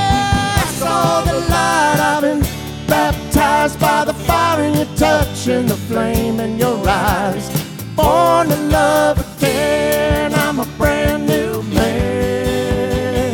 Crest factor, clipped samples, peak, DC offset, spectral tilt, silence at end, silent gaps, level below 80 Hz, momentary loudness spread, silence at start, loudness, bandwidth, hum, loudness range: 14 dB; under 0.1%; 0 dBFS; under 0.1%; -5 dB/octave; 0 s; none; -28 dBFS; 5 LU; 0 s; -15 LUFS; over 20 kHz; none; 2 LU